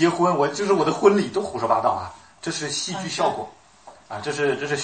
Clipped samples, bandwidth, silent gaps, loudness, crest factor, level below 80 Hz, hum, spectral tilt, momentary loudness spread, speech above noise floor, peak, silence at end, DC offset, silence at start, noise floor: under 0.1%; 8.8 kHz; none; -22 LUFS; 20 dB; -62 dBFS; none; -4.5 dB/octave; 15 LU; 27 dB; -2 dBFS; 0 s; 0.1%; 0 s; -48 dBFS